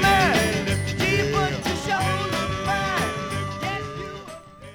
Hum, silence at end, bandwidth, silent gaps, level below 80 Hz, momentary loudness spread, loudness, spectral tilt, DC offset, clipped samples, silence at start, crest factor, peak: none; 0 s; over 20 kHz; none; -40 dBFS; 14 LU; -23 LUFS; -4.5 dB/octave; under 0.1%; under 0.1%; 0 s; 16 dB; -8 dBFS